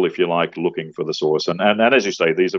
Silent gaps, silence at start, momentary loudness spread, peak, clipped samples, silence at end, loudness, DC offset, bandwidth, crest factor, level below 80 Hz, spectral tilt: none; 0 s; 9 LU; 0 dBFS; under 0.1%; 0 s; -18 LUFS; under 0.1%; 7.4 kHz; 18 dB; -66 dBFS; -5 dB/octave